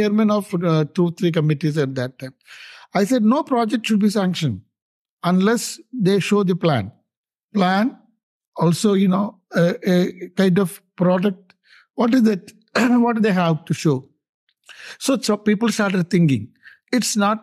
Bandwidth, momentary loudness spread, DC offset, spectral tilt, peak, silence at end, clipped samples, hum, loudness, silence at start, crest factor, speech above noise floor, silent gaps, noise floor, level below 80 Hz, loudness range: 13 kHz; 10 LU; under 0.1%; -6 dB/octave; -4 dBFS; 0.05 s; under 0.1%; none; -19 LUFS; 0 s; 16 dB; 35 dB; 4.82-5.17 s, 7.17-7.24 s, 7.44-7.49 s, 8.23-8.41 s, 8.47-8.52 s, 14.29-14.47 s; -54 dBFS; -68 dBFS; 2 LU